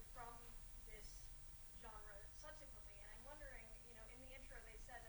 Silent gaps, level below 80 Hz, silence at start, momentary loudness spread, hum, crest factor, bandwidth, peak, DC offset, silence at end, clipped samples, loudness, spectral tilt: none; -62 dBFS; 0 s; 2 LU; none; 14 dB; 19.5 kHz; -42 dBFS; under 0.1%; 0 s; under 0.1%; -56 LUFS; -3 dB/octave